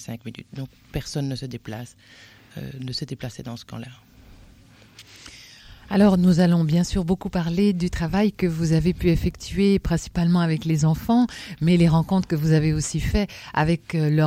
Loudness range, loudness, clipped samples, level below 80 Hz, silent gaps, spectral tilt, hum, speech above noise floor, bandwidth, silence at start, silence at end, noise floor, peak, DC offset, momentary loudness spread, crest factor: 15 LU; -22 LUFS; under 0.1%; -38 dBFS; none; -6.5 dB/octave; none; 29 dB; 15.5 kHz; 0 s; 0 s; -51 dBFS; -6 dBFS; under 0.1%; 19 LU; 16 dB